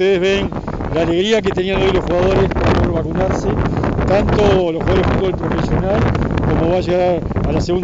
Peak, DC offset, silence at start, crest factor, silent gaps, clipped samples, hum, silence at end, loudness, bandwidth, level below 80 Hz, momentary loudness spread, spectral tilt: -4 dBFS; under 0.1%; 0 s; 12 dB; none; under 0.1%; none; 0 s; -16 LUFS; 7.8 kHz; -26 dBFS; 4 LU; -7 dB/octave